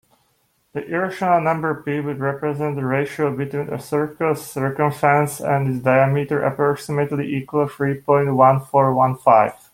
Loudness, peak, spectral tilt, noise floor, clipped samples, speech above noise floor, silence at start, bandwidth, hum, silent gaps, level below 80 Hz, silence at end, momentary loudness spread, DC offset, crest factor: -19 LUFS; -2 dBFS; -7.5 dB/octave; -65 dBFS; under 0.1%; 46 dB; 0.75 s; 16.5 kHz; none; none; -60 dBFS; 0.2 s; 9 LU; under 0.1%; 18 dB